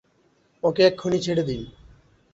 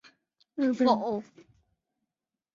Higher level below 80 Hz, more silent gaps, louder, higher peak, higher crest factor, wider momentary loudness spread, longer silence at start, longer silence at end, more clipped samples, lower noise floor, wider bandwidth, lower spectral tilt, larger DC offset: first, -52 dBFS vs -74 dBFS; neither; first, -23 LUFS vs -28 LUFS; first, -4 dBFS vs -10 dBFS; about the same, 20 dB vs 20 dB; about the same, 14 LU vs 13 LU; about the same, 0.65 s vs 0.55 s; second, 0.65 s vs 1.3 s; neither; second, -63 dBFS vs -88 dBFS; about the same, 8 kHz vs 7.4 kHz; about the same, -5.5 dB/octave vs -6 dB/octave; neither